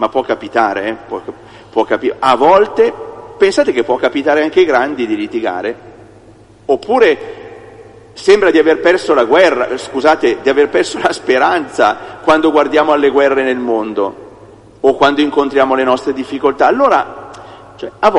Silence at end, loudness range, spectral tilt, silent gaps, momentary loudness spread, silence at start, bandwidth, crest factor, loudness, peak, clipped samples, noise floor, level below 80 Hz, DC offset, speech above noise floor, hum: 0 s; 4 LU; -4.5 dB/octave; none; 13 LU; 0 s; 11 kHz; 12 dB; -12 LUFS; 0 dBFS; under 0.1%; -41 dBFS; -50 dBFS; under 0.1%; 29 dB; none